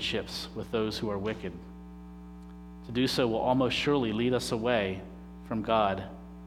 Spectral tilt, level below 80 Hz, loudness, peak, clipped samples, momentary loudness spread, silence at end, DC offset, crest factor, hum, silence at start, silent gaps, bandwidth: -5.5 dB/octave; -50 dBFS; -30 LUFS; -10 dBFS; under 0.1%; 20 LU; 0 s; under 0.1%; 20 dB; 60 Hz at -45 dBFS; 0 s; none; 15.5 kHz